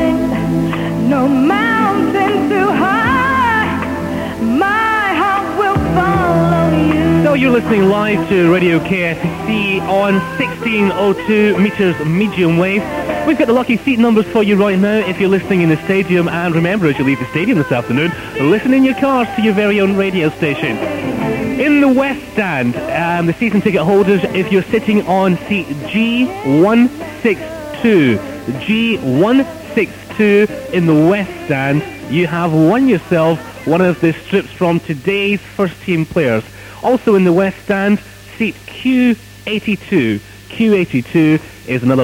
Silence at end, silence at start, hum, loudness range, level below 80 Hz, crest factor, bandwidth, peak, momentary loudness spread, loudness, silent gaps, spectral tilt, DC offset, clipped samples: 0 s; 0 s; none; 2 LU; -40 dBFS; 14 dB; 16.5 kHz; 0 dBFS; 7 LU; -14 LUFS; none; -7 dB/octave; under 0.1%; under 0.1%